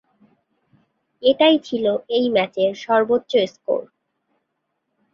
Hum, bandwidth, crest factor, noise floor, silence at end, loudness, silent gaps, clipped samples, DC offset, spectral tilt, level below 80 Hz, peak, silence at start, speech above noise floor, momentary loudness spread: none; 7.2 kHz; 20 dB; -75 dBFS; 1.3 s; -19 LUFS; none; under 0.1%; under 0.1%; -5.5 dB/octave; -66 dBFS; -2 dBFS; 1.2 s; 56 dB; 8 LU